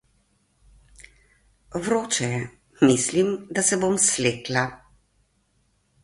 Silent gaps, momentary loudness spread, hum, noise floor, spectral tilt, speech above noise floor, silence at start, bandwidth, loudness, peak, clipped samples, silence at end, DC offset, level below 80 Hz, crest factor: none; 12 LU; none; -67 dBFS; -3.5 dB/octave; 45 dB; 1.7 s; 11.5 kHz; -22 LUFS; -6 dBFS; under 0.1%; 1.25 s; under 0.1%; -58 dBFS; 20 dB